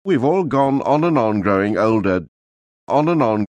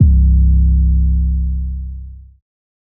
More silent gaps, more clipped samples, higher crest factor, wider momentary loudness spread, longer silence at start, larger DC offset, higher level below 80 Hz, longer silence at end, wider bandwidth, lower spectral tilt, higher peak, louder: first, 2.28-2.87 s vs none; neither; about the same, 14 dB vs 12 dB; second, 3 LU vs 15 LU; about the same, 0.05 s vs 0 s; neither; second, -54 dBFS vs -14 dBFS; second, 0.05 s vs 0.8 s; first, 9 kHz vs 0.5 kHz; second, -8.5 dB/octave vs -18.5 dB/octave; second, -4 dBFS vs 0 dBFS; about the same, -17 LUFS vs -15 LUFS